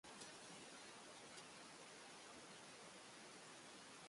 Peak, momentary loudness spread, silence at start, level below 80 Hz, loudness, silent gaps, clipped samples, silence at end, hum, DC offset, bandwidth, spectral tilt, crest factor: -42 dBFS; 2 LU; 0.05 s; -90 dBFS; -58 LUFS; none; under 0.1%; 0 s; none; under 0.1%; 11.5 kHz; -2 dB/octave; 18 dB